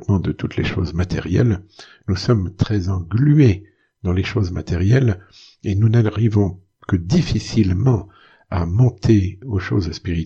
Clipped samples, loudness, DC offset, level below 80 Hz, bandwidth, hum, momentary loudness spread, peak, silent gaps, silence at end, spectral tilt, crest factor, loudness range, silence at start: under 0.1%; -19 LUFS; under 0.1%; -38 dBFS; 7.6 kHz; none; 9 LU; -2 dBFS; none; 0 s; -7.5 dB/octave; 16 dB; 1 LU; 0 s